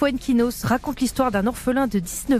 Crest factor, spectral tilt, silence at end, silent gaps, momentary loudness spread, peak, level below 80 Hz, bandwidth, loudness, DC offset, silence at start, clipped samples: 14 dB; -5 dB/octave; 0 s; none; 3 LU; -8 dBFS; -40 dBFS; 15.5 kHz; -22 LUFS; under 0.1%; 0 s; under 0.1%